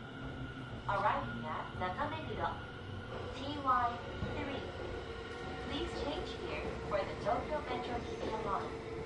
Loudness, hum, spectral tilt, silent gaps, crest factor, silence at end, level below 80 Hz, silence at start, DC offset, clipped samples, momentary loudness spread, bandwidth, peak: -39 LUFS; none; -6 dB/octave; none; 18 dB; 0 s; -52 dBFS; 0 s; under 0.1%; under 0.1%; 11 LU; 11.5 kHz; -20 dBFS